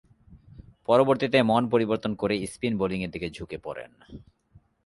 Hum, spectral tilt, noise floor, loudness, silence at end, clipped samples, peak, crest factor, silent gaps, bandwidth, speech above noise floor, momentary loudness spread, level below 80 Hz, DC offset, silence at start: none; -6 dB/octave; -60 dBFS; -25 LUFS; 0.65 s; under 0.1%; -6 dBFS; 20 dB; none; 12 kHz; 34 dB; 17 LU; -54 dBFS; under 0.1%; 0.3 s